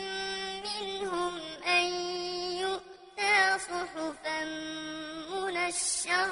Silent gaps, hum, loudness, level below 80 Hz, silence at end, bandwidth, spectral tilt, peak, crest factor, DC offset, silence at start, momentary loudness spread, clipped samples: none; none; -31 LUFS; -64 dBFS; 0 s; 11 kHz; -1 dB/octave; -12 dBFS; 20 dB; under 0.1%; 0 s; 11 LU; under 0.1%